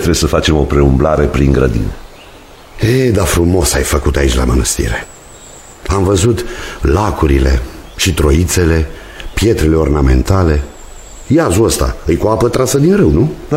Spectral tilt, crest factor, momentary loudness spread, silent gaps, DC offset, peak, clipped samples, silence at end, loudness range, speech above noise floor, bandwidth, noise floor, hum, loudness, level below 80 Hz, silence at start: -5.5 dB/octave; 12 dB; 8 LU; none; 0.1%; 0 dBFS; under 0.1%; 0 s; 2 LU; 25 dB; 16.5 kHz; -36 dBFS; none; -12 LUFS; -18 dBFS; 0 s